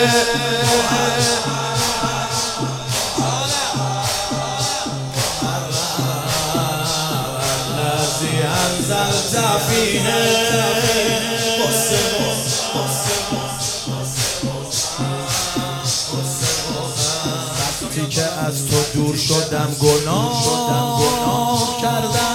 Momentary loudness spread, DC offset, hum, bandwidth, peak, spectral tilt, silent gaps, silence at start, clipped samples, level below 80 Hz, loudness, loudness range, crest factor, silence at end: 6 LU; under 0.1%; none; 17 kHz; 0 dBFS; -3 dB/octave; none; 0 s; under 0.1%; -42 dBFS; -18 LUFS; 4 LU; 18 dB; 0 s